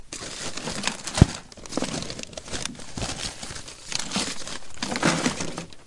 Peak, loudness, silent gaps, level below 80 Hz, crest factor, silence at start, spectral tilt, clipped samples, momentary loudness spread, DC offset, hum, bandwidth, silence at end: 0 dBFS; -28 LUFS; none; -40 dBFS; 28 dB; 0 s; -4 dB/octave; under 0.1%; 14 LU; under 0.1%; none; 11.5 kHz; 0 s